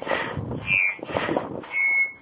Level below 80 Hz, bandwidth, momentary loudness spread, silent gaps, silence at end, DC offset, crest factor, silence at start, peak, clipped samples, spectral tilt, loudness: -50 dBFS; 4 kHz; 9 LU; none; 0.05 s; under 0.1%; 20 dB; 0 s; -6 dBFS; under 0.1%; -3 dB/octave; -23 LUFS